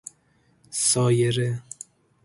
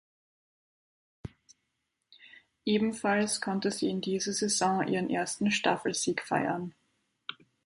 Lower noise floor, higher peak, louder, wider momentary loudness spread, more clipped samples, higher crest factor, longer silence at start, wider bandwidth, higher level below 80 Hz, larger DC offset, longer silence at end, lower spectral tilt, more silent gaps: second, -63 dBFS vs -82 dBFS; first, -8 dBFS vs -12 dBFS; first, -23 LUFS vs -30 LUFS; first, 22 LU vs 16 LU; neither; about the same, 16 dB vs 20 dB; second, 0.7 s vs 1.25 s; about the same, 11.5 kHz vs 11.5 kHz; about the same, -62 dBFS vs -66 dBFS; neither; first, 0.65 s vs 0.3 s; about the same, -4.5 dB/octave vs -3.5 dB/octave; neither